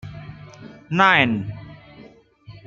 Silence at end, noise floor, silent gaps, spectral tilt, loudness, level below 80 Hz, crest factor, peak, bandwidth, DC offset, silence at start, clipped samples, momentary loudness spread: 0.1 s; -48 dBFS; none; -6 dB/octave; -18 LUFS; -54 dBFS; 22 dB; -2 dBFS; 7.6 kHz; under 0.1%; 0.05 s; under 0.1%; 26 LU